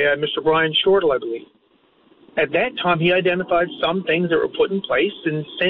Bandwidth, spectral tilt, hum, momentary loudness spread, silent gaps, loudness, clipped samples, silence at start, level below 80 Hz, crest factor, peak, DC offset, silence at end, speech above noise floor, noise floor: 4.7 kHz; -2.5 dB/octave; none; 8 LU; none; -19 LUFS; under 0.1%; 0 s; -54 dBFS; 12 dB; -8 dBFS; under 0.1%; 0 s; 39 dB; -58 dBFS